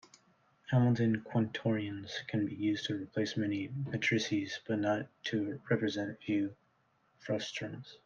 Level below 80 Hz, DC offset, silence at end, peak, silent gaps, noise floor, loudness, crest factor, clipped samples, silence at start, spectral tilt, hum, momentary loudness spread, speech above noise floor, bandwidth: -74 dBFS; under 0.1%; 0.1 s; -16 dBFS; none; -73 dBFS; -34 LUFS; 18 dB; under 0.1%; 0.7 s; -6 dB/octave; none; 9 LU; 39 dB; 7.4 kHz